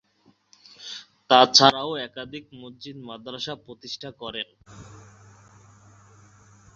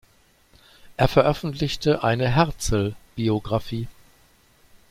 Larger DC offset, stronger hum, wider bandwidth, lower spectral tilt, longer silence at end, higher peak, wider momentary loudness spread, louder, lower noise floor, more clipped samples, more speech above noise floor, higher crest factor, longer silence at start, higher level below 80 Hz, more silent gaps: neither; neither; second, 7.8 kHz vs 16 kHz; second, -1 dB/octave vs -6 dB/octave; first, 1.95 s vs 1 s; about the same, -2 dBFS vs -2 dBFS; first, 25 LU vs 12 LU; first, -20 LUFS vs -23 LUFS; first, -63 dBFS vs -58 dBFS; neither; about the same, 39 dB vs 37 dB; about the same, 26 dB vs 22 dB; about the same, 0.8 s vs 0.85 s; second, -64 dBFS vs -40 dBFS; neither